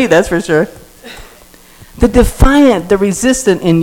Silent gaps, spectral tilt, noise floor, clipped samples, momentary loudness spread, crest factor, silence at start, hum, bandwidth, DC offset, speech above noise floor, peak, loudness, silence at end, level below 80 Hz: none; -5.5 dB/octave; -40 dBFS; 2%; 16 LU; 12 dB; 0 s; none; 18.5 kHz; under 0.1%; 30 dB; 0 dBFS; -11 LUFS; 0 s; -20 dBFS